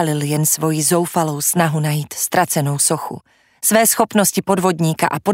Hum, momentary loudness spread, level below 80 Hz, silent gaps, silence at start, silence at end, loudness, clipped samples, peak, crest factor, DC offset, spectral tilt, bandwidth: none; 6 LU; -60 dBFS; none; 0 s; 0 s; -16 LUFS; under 0.1%; 0 dBFS; 16 dB; under 0.1%; -4 dB/octave; 16.5 kHz